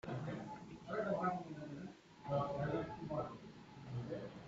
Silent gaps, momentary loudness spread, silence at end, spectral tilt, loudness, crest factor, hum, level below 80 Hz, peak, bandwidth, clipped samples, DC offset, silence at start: none; 15 LU; 0 s; -6.5 dB/octave; -44 LUFS; 18 dB; none; -68 dBFS; -26 dBFS; 8 kHz; under 0.1%; under 0.1%; 0.05 s